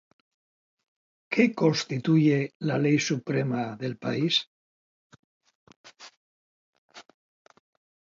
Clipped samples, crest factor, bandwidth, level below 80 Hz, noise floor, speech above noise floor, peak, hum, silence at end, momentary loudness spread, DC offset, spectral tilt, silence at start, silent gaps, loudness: under 0.1%; 22 dB; 7.6 kHz; -72 dBFS; under -90 dBFS; over 65 dB; -8 dBFS; none; 1.1 s; 8 LU; under 0.1%; -5.5 dB/octave; 1.3 s; 2.55-2.60 s, 4.47-5.10 s, 5.19-5.41 s, 5.55-5.67 s, 5.76-5.84 s, 6.17-6.89 s; -26 LUFS